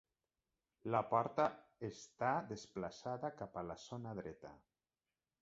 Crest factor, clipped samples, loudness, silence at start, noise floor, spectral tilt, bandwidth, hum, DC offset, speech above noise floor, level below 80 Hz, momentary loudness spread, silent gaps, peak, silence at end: 22 dB; under 0.1%; -42 LUFS; 0.85 s; under -90 dBFS; -5.5 dB/octave; 7.6 kHz; none; under 0.1%; over 48 dB; -74 dBFS; 13 LU; none; -20 dBFS; 0.85 s